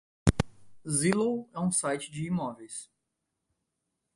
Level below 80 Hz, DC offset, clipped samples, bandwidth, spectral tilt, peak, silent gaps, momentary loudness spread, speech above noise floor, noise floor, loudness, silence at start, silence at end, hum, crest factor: -46 dBFS; under 0.1%; under 0.1%; 11.5 kHz; -5 dB/octave; -4 dBFS; none; 15 LU; 53 dB; -83 dBFS; -30 LUFS; 0.25 s; 1.3 s; none; 28 dB